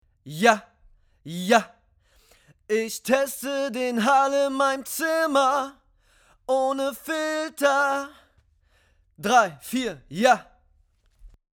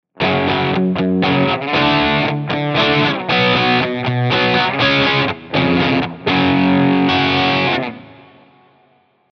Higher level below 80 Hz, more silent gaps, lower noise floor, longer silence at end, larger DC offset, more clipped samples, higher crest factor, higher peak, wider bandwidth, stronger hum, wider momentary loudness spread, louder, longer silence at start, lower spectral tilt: second, -62 dBFS vs -46 dBFS; neither; first, -63 dBFS vs -56 dBFS; second, 0.3 s vs 1.2 s; neither; neither; first, 22 dB vs 14 dB; about the same, -4 dBFS vs -2 dBFS; first, over 20 kHz vs 6.4 kHz; neither; first, 11 LU vs 5 LU; second, -23 LUFS vs -15 LUFS; about the same, 0.25 s vs 0.2 s; second, -3.5 dB/octave vs -6.5 dB/octave